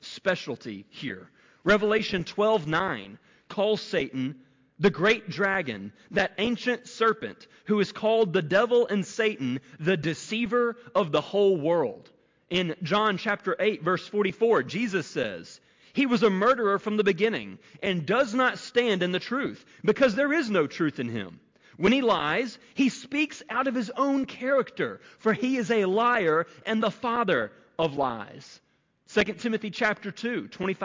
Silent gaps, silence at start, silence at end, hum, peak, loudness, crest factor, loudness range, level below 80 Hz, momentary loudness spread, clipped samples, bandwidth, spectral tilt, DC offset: none; 0.05 s; 0 s; none; -12 dBFS; -26 LUFS; 14 dB; 2 LU; -62 dBFS; 11 LU; under 0.1%; 7.6 kHz; -5.5 dB/octave; under 0.1%